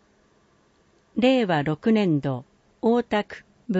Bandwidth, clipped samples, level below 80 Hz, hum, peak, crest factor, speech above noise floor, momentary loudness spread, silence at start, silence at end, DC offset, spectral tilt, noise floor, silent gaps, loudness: 8 kHz; under 0.1%; -60 dBFS; none; -8 dBFS; 16 dB; 40 dB; 14 LU; 1.15 s; 0 s; under 0.1%; -7.5 dB/octave; -62 dBFS; none; -23 LUFS